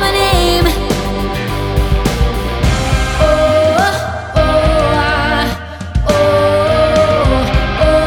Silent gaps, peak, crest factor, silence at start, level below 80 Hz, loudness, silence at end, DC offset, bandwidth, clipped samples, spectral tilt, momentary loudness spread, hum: none; 0 dBFS; 12 dB; 0 s; -18 dBFS; -13 LUFS; 0 s; under 0.1%; 19 kHz; under 0.1%; -5.5 dB/octave; 7 LU; none